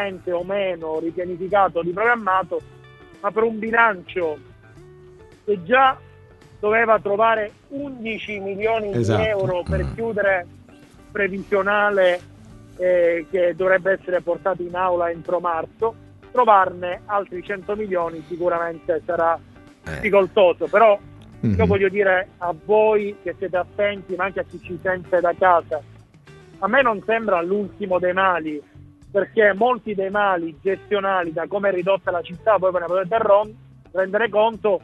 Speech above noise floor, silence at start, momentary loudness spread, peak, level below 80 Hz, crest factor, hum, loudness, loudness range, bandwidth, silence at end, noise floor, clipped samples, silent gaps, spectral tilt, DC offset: 27 dB; 0 s; 11 LU; 0 dBFS; -48 dBFS; 20 dB; none; -21 LUFS; 3 LU; 10 kHz; 0.05 s; -47 dBFS; under 0.1%; none; -7 dB/octave; under 0.1%